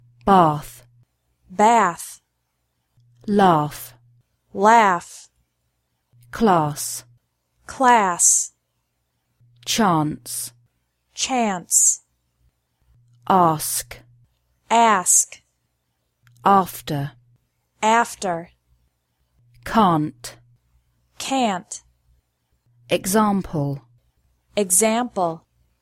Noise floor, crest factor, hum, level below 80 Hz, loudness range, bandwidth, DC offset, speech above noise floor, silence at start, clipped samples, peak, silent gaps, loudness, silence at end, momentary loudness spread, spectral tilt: -73 dBFS; 20 dB; none; -54 dBFS; 5 LU; 16.5 kHz; under 0.1%; 54 dB; 0.25 s; under 0.1%; -2 dBFS; none; -19 LUFS; 0.45 s; 21 LU; -3.5 dB/octave